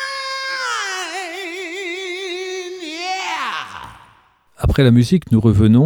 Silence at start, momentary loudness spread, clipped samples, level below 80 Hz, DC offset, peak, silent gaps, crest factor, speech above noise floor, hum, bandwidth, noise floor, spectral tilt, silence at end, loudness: 0 s; 14 LU; under 0.1%; -34 dBFS; under 0.1%; -2 dBFS; none; 16 dB; 41 dB; none; 17.5 kHz; -53 dBFS; -6 dB/octave; 0 s; -19 LUFS